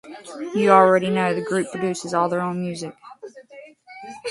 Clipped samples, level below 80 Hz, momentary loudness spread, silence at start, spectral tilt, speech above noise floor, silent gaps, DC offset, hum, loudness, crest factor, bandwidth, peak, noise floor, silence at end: under 0.1%; -68 dBFS; 26 LU; 0.05 s; -5.5 dB/octave; 24 dB; none; under 0.1%; none; -20 LUFS; 22 dB; 11.5 kHz; 0 dBFS; -45 dBFS; 0 s